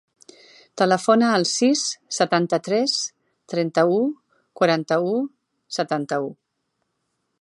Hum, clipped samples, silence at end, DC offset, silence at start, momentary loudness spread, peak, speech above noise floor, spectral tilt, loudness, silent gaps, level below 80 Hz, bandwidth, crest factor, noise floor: none; under 0.1%; 1.05 s; under 0.1%; 0.75 s; 13 LU; -4 dBFS; 55 dB; -4 dB/octave; -21 LUFS; none; -76 dBFS; 11.5 kHz; 20 dB; -75 dBFS